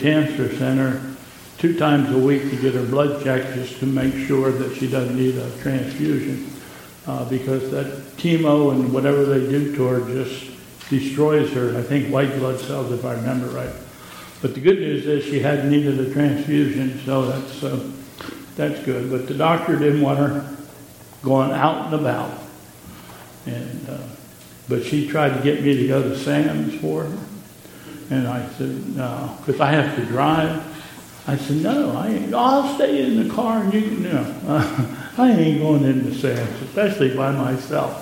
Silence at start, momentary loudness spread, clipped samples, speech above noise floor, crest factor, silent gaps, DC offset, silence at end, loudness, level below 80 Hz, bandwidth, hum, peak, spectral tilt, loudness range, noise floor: 0 s; 17 LU; under 0.1%; 23 dB; 20 dB; none; under 0.1%; 0 s; -21 LUFS; -56 dBFS; 17 kHz; none; 0 dBFS; -7 dB/octave; 4 LU; -42 dBFS